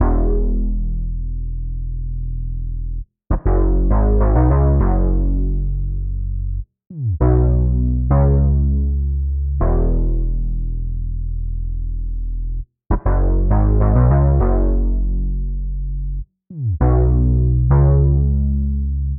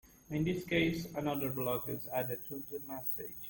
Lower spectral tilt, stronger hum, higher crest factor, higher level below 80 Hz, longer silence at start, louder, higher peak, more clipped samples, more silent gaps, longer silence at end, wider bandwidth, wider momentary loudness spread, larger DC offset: first, -14 dB/octave vs -6 dB/octave; neither; about the same, 14 dB vs 18 dB; first, -18 dBFS vs -60 dBFS; about the same, 0 s vs 0.05 s; first, -19 LUFS vs -36 LUFS; first, -2 dBFS vs -18 dBFS; neither; neither; about the same, 0 s vs 0 s; second, 2.2 kHz vs 17 kHz; first, 13 LU vs 9 LU; neither